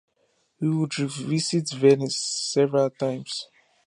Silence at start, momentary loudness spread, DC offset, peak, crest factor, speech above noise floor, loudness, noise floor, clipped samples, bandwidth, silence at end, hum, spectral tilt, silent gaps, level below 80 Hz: 0.6 s; 12 LU; under 0.1%; -6 dBFS; 18 dB; 45 dB; -24 LUFS; -69 dBFS; under 0.1%; 11 kHz; 0.4 s; none; -5 dB/octave; none; -74 dBFS